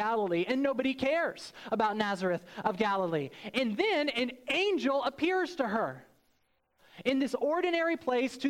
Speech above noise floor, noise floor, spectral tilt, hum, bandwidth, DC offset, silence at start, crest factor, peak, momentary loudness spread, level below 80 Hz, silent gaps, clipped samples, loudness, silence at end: 43 dB; -73 dBFS; -5 dB/octave; none; 16 kHz; under 0.1%; 0 s; 16 dB; -16 dBFS; 6 LU; -70 dBFS; none; under 0.1%; -31 LUFS; 0 s